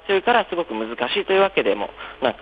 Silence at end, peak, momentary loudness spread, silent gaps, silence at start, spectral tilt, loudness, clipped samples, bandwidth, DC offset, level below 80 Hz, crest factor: 0 s; -4 dBFS; 9 LU; none; 0.05 s; -6.5 dB/octave; -21 LUFS; under 0.1%; 5 kHz; under 0.1%; -54 dBFS; 18 dB